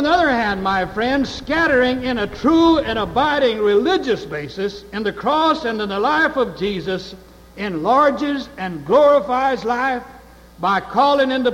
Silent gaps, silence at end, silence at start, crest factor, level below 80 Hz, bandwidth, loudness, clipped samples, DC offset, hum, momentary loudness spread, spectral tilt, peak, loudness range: none; 0 s; 0 s; 14 dB; -44 dBFS; 15.5 kHz; -18 LUFS; under 0.1%; under 0.1%; none; 11 LU; -5.5 dB/octave; -4 dBFS; 3 LU